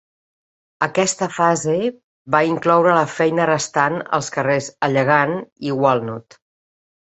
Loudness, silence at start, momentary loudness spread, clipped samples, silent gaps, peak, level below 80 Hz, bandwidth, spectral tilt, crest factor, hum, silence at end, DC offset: -18 LUFS; 0.8 s; 8 LU; under 0.1%; 2.04-2.25 s, 5.52-5.56 s; 0 dBFS; -62 dBFS; 8.4 kHz; -4.5 dB/octave; 18 dB; none; 0.8 s; under 0.1%